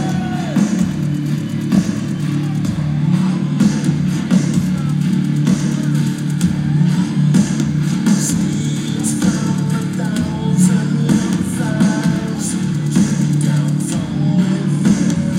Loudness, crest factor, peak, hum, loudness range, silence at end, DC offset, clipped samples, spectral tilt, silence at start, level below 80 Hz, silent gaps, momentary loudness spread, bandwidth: -16 LUFS; 12 dB; -4 dBFS; none; 1 LU; 0 s; under 0.1%; under 0.1%; -6 dB/octave; 0 s; -44 dBFS; none; 5 LU; 15 kHz